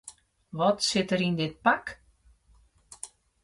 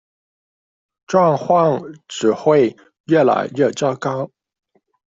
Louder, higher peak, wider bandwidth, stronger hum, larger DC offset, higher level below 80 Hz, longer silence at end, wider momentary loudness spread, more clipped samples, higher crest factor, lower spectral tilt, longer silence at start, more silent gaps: second, -26 LUFS vs -17 LUFS; second, -10 dBFS vs -2 dBFS; first, 11.5 kHz vs 7.8 kHz; neither; neither; about the same, -62 dBFS vs -62 dBFS; second, 0.4 s vs 0.85 s; first, 18 LU vs 10 LU; neither; about the same, 20 dB vs 16 dB; second, -4 dB/octave vs -6 dB/octave; second, 0.05 s vs 1.1 s; second, none vs 3.00-3.04 s